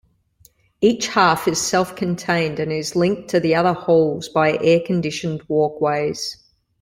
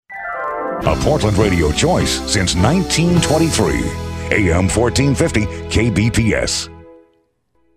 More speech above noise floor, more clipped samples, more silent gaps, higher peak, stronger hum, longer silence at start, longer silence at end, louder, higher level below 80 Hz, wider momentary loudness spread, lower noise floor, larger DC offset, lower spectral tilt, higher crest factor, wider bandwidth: second, 37 dB vs 45 dB; neither; neither; about the same, -2 dBFS vs 0 dBFS; neither; first, 0.8 s vs 0.1 s; second, 0.5 s vs 0.85 s; second, -19 LUFS vs -16 LUFS; second, -56 dBFS vs -28 dBFS; about the same, 7 LU vs 8 LU; second, -56 dBFS vs -60 dBFS; neither; about the same, -5 dB/octave vs -5 dB/octave; about the same, 18 dB vs 16 dB; about the same, 16.5 kHz vs 15.5 kHz